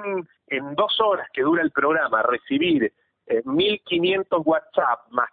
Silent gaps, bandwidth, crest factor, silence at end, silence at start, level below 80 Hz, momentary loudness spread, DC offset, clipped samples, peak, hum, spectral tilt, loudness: none; 4.7 kHz; 16 dB; 0.05 s; 0 s; -62 dBFS; 7 LU; under 0.1%; under 0.1%; -6 dBFS; none; -9.5 dB/octave; -22 LUFS